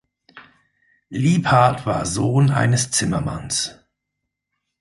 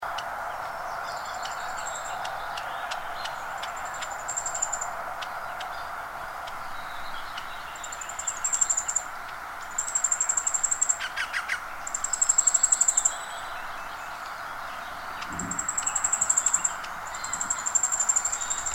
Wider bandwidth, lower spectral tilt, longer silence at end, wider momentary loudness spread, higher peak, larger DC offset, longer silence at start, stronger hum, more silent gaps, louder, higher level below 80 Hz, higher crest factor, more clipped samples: second, 11.5 kHz vs 16.5 kHz; first, -5 dB/octave vs 0.5 dB/octave; first, 1.1 s vs 0 s; second, 8 LU vs 15 LU; first, -2 dBFS vs -8 dBFS; neither; first, 0.35 s vs 0 s; first, 50 Hz at -45 dBFS vs none; neither; first, -19 LUFS vs -27 LUFS; first, -46 dBFS vs -54 dBFS; about the same, 20 dB vs 22 dB; neither